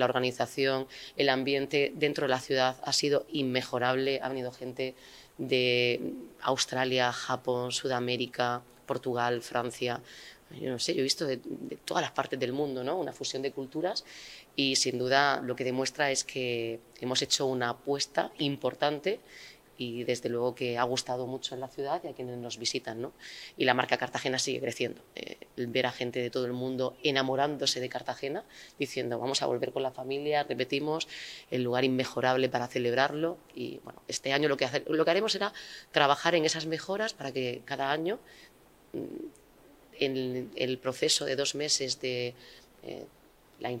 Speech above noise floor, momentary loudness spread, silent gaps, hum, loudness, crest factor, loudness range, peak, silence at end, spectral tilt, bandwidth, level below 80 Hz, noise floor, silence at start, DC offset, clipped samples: 27 dB; 13 LU; none; none; -31 LUFS; 24 dB; 4 LU; -8 dBFS; 0 s; -3.5 dB/octave; 16 kHz; -70 dBFS; -58 dBFS; 0 s; under 0.1%; under 0.1%